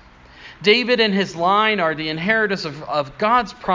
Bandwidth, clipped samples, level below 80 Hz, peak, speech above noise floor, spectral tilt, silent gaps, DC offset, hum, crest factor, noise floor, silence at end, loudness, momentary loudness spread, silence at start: 7.6 kHz; under 0.1%; -52 dBFS; 0 dBFS; 25 dB; -5 dB/octave; none; under 0.1%; none; 18 dB; -43 dBFS; 0 s; -18 LUFS; 8 LU; 0.4 s